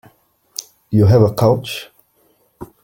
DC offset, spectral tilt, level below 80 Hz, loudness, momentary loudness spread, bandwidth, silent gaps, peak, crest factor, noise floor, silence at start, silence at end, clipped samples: under 0.1%; -7 dB/octave; -48 dBFS; -15 LUFS; 19 LU; 17 kHz; none; -2 dBFS; 16 dB; -59 dBFS; 0.6 s; 0.2 s; under 0.1%